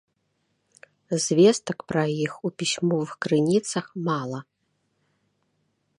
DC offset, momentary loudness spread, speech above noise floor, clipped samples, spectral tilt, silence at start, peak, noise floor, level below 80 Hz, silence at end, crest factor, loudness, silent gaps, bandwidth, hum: under 0.1%; 11 LU; 50 dB; under 0.1%; -5 dB/octave; 1.1 s; -6 dBFS; -73 dBFS; -68 dBFS; 1.55 s; 20 dB; -24 LUFS; none; 11.5 kHz; none